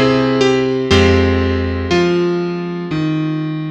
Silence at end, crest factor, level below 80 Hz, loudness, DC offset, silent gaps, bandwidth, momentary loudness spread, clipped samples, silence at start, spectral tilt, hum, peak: 0 s; 14 dB; -32 dBFS; -15 LUFS; under 0.1%; none; 9 kHz; 8 LU; under 0.1%; 0 s; -6.5 dB/octave; none; 0 dBFS